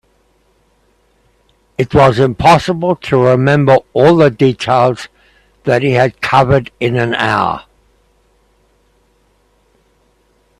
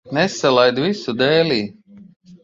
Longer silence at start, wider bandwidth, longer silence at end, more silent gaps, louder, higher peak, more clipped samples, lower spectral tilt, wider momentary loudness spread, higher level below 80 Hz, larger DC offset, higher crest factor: first, 1.8 s vs 0.05 s; first, 12.5 kHz vs 7.8 kHz; first, 3 s vs 0.1 s; second, none vs 2.16-2.20 s; first, -12 LUFS vs -17 LUFS; about the same, 0 dBFS vs 0 dBFS; neither; first, -7 dB/octave vs -5 dB/octave; about the same, 9 LU vs 7 LU; first, -42 dBFS vs -58 dBFS; neither; about the same, 14 dB vs 18 dB